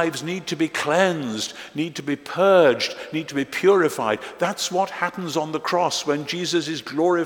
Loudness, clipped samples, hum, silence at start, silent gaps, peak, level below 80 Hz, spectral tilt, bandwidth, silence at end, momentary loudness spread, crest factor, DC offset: -22 LUFS; under 0.1%; none; 0 s; none; -2 dBFS; -68 dBFS; -4 dB/octave; 18 kHz; 0 s; 10 LU; 20 dB; under 0.1%